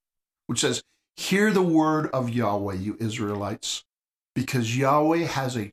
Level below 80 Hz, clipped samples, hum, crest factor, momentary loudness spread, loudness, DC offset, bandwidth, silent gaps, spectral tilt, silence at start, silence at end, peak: -62 dBFS; under 0.1%; none; 16 dB; 10 LU; -25 LUFS; under 0.1%; 15.5 kHz; 3.98-4.02 s, 4.18-4.22 s; -5 dB/octave; 0.5 s; 0 s; -8 dBFS